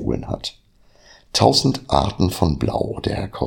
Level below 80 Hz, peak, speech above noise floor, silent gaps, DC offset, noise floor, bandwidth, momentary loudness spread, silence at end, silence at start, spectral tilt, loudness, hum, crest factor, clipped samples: -36 dBFS; 0 dBFS; 31 dB; none; under 0.1%; -51 dBFS; 17 kHz; 12 LU; 0 s; 0 s; -5.5 dB/octave; -20 LUFS; none; 20 dB; under 0.1%